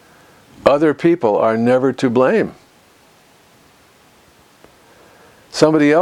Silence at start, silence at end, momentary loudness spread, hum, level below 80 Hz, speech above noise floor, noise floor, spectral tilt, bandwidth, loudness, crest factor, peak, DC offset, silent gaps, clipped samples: 0.65 s; 0 s; 5 LU; none; -56 dBFS; 36 dB; -50 dBFS; -6 dB/octave; 13 kHz; -15 LUFS; 18 dB; 0 dBFS; under 0.1%; none; under 0.1%